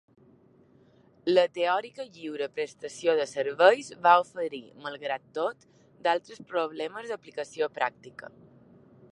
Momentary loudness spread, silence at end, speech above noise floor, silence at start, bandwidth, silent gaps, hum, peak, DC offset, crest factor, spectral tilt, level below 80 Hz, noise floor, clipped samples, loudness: 17 LU; 0.85 s; 32 dB; 1.25 s; 11 kHz; none; none; -6 dBFS; under 0.1%; 24 dB; -3.5 dB/octave; -80 dBFS; -60 dBFS; under 0.1%; -28 LUFS